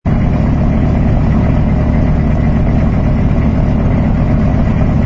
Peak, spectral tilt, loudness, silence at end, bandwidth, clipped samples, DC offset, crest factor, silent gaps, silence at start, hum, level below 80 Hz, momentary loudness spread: 0 dBFS; -10 dB/octave; -13 LUFS; 0 s; 6.6 kHz; under 0.1%; under 0.1%; 10 dB; none; 0.05 s; none; -16 dBFS; 1 LU